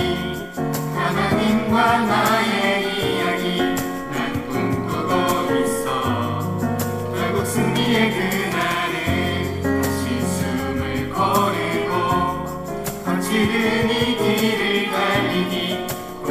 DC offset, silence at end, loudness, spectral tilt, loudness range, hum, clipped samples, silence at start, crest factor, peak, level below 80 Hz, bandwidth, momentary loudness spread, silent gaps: under 0.1%; 0 s; -20 LUFS; -5 dB/octave; 3 LU; none; under 0.1%; 0 s; 16 dB; -4 dBFS; -46 dBFS; 16 kHz; 7 LU; none